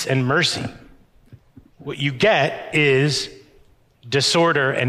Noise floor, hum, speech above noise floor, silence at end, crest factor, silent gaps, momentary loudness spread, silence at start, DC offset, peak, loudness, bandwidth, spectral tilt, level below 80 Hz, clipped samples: -53 dBFS; none; 34 dB; 0 s; 14 dB; none; 15 LU; 0 s; under 0.1%; -6 dBFS; -18 LUFS; 15 kHz; -4.5 dB/octave; -54 dBFS; under 0.1%